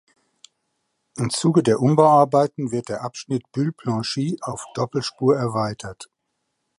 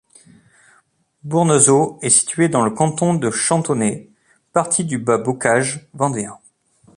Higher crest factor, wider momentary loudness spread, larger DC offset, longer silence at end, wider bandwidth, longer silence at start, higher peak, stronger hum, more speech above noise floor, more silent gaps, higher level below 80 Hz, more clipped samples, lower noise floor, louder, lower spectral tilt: about the same, 20 dB vs 18 dB; first, 14 LU vs 10 LU; neither; first, 0.75 s vs 0.6 s; about the same, 11.5 kHz vs 11.5 kHz; about the same, 1.15 s vs 1.25 s; about the same, -2 dBFS vs 0 dBFS; neither; first, 55 dB vs 42 dB; neither; about the same, -60 dBFS vs -60 dBFS; neither; first, -76 dBFS vs -59 dBFS; second, -21 LUFS vs -17 LUFS; first, -6 dB/octave vs -4.5 dB/octave